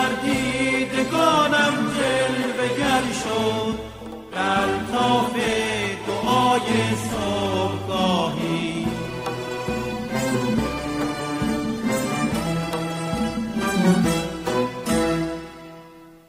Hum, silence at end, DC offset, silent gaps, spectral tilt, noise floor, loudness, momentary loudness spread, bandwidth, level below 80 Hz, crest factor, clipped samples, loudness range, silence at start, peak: none; 0.1 s; under 0.1%; none; -4.5 dB/octave; -45 dBFS; -22 LUFS; 8 LU; 16 kHz; -44 dBFS; 16 dB; under 0.1%; 4 LU; 0 s; -6 dBFS